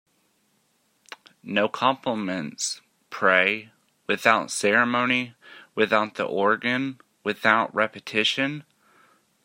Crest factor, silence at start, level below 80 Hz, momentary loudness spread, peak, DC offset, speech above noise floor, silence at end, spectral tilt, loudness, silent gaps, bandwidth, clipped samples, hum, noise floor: 24 dB; 1.45 s; -74 dBFS; 13 LU; -2 dBFS; under 0.1%; 44 dB; 0.85 s; -3 dB/octave; -23 LUFS; none; 16 kHz; under 0.1%; none; -68 dBFS